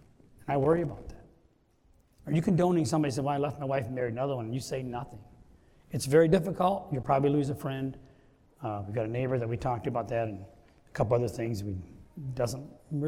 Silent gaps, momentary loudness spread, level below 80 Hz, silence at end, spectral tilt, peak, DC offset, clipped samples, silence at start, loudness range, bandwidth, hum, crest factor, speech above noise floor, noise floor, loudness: none; 15 LU; -56 dBFS; 0 s; -7 dB/octave; -10 dBFS; under 0.1%; under 0.1%; 0.4 s; 5 LU; 16 kHz; none; 20 dB; 36 dB; -65 dBFS; -30 LUFS